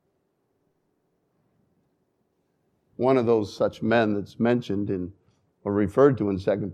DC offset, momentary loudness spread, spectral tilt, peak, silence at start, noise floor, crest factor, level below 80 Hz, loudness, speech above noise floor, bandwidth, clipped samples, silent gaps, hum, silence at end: under 0.1%; 10 LU; -8 dB/octave; -6 dBFS; 3 s; -73 dBFS; 20 dB; -62 dBFS; -24 LUFS; 50 dB; 10 kHz; under 0.1%; none; none; 0 s